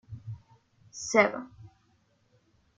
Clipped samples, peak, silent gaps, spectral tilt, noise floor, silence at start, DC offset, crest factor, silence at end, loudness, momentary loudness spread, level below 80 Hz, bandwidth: under 0.1%; -6 dBFS; none; -4 dB/octave; -69 dBFS; 0.1 s; under 0.1%; 28 dB; 1.1 s; -27 LUFS; 23 LU; -66 dBFS; 9.4 kHz